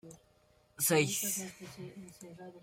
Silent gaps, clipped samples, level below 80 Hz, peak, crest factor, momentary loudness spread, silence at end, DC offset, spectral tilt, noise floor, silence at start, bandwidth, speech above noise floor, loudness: none; under 0.1%; -72 dBFS; -16 dBFS; 22 dB; 22 LU; 0.05 s; under 0.1%; -3 dB/octave; -68 dBFS; 0.05 s; 16.5 kHz; 32 dB; -31 LUFS